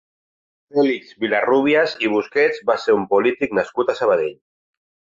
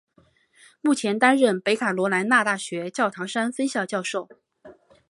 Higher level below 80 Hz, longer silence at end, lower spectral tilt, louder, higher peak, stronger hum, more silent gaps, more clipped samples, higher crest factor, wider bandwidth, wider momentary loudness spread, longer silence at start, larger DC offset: first, -62 dBFS vs -74 dBFS; first, 0.8 s vs 0.4 s; first, -5.5 dB/octave vs -4 dB/octave; first, -19 LUFS vs -23 LUFS; about the same, -4 dBFS vs -4 dBFS; neither; neither; neither; second, 14 dB vs 20 dB; second, 7.6 kHz vs 11.5 kHz; second, 5 LU vs 9 LU; about the same, 0.75 s vs 0.85 s; neither